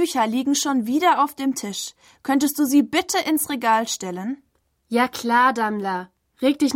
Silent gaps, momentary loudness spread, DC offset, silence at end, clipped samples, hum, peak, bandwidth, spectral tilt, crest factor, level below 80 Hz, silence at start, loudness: none; 12 LU; under 0.1%; 0 s; under 0.1%; none; -6 dBFS; 16.5 kHz; -3 dB/octave; 14 dB; -66 dBFS; 0 s; -21 LUFS